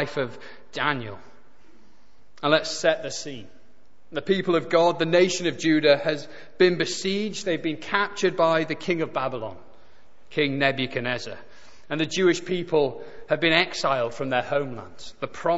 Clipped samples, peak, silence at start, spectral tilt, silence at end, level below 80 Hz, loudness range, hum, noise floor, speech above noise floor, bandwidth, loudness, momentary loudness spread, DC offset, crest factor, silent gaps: under 0.1%; -2 dBFS; 0 s; -4.5 dB/octave; 0 s; -62 dBFS; 5 LU; none; -61 dBFS; 37 dB; 8 kHz; -24 LUFS; 15 LU; 1%; 22 dB; none